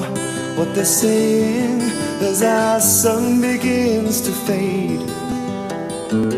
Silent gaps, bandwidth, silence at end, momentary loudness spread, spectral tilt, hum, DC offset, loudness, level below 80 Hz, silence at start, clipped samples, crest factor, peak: none; 15.5 kHz; 0 s; 10 LU; -4 dB/octave; none; under 0.1%; -18 LUFS; -52 dBFS; 0 s; under 0.1%; 16 dB; -2 dBFS